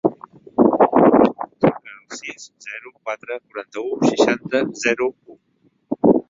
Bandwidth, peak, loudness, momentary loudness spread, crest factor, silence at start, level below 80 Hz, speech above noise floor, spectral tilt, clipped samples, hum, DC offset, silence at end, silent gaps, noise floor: 7.8 kHz; -2 dBFS; -18 LUFS; 19 LU; 18 dB; 0.05 s; -56 dBFS; 39 dB; -5.5 dB/octave; under 0.1%; none; under 0.1%; 0.1 s; none; -62 dBFS